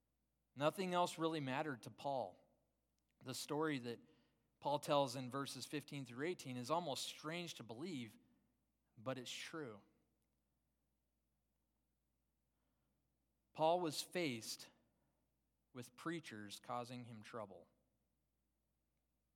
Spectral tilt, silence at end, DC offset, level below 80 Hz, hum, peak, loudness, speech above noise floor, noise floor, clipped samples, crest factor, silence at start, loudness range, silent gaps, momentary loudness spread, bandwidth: -4.5 dB/octave; 1.75 s; under 0.1%; under -90 dBFS; none; -24 dBFS; -45 LUFS; 43 dB; -87 dBFS; under 0.1%; 24 dB; 0.55 s; 10 LU; none; 16 LU; 17.5 kHz